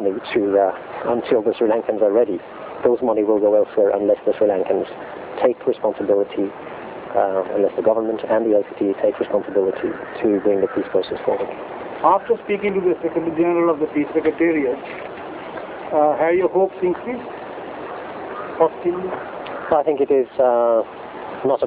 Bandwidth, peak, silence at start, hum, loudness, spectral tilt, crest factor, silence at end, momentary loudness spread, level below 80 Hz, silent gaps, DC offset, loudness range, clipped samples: 4 kHz; -2 dBFS; 0 s; none; -20 LUFS; -10 dB/octave; 18 dB; 0 s; 14 LU; -58 dBFS; none; under 0.1%; 3 LU; under 0.1%